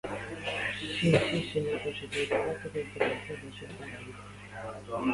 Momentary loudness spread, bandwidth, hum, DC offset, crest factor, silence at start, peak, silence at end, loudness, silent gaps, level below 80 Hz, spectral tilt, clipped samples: 17 LU; 11.5 kHz; 50 Hz at -50 dBFS; under 0.1%; 22 dB; 0.05 s; -10 dBFS; 0 s; -32 LUFS; none; -56 dBFS; -5.5 dB/octave; under 0.1%